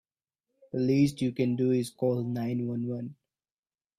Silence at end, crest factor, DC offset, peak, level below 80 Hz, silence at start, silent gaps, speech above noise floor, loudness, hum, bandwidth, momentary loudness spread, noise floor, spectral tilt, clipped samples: 0.85 s; 16 dB; under 0.1%; -14 dBFS; -68 dBFS; 0.75 s; none; over 62 dB; -29 LUFS; none; 14 kHz; 11 LU; under -90 dBFS; -7.5 dB/octave; under 0.1%